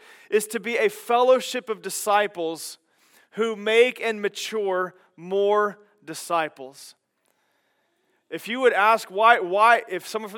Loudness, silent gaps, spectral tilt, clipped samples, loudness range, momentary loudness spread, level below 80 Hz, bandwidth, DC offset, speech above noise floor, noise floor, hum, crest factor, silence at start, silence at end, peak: -22 LUFS; none; -2.5 dB/octave; under 0.1%; 7 LU; 16 LU; under -90 dBFS; 17.5 kHz; under 0.1%; 48 dB; -71 dBFS; none; 22 dB; 0.3 s; 0 s; -2 dBFS